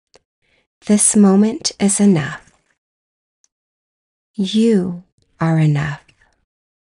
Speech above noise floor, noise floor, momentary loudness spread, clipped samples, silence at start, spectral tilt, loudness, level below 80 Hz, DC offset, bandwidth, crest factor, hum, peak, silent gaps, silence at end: over 76 dB; under -90 dBFS; 22 LU; under 0.1%; 0.85 s; -5 dB/octave; -15 LUFS; -56 dBFS; under 0.1%; 11.5 kHz; 18 dB; none; 0 dBFS; 2.78-3.44 s, 3.52-4.34 s, 5.12-5.18 s; 1 s